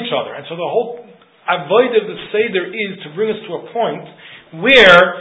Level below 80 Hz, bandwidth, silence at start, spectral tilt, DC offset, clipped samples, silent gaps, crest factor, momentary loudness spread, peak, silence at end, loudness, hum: -50 dBFS; 8 kHz; 0 s; -4.5 dB/octave; under 0.1%; 0.2%; none; 16 dB; 20 LU; 0 dBFS; 0 s; -14 LUFS; none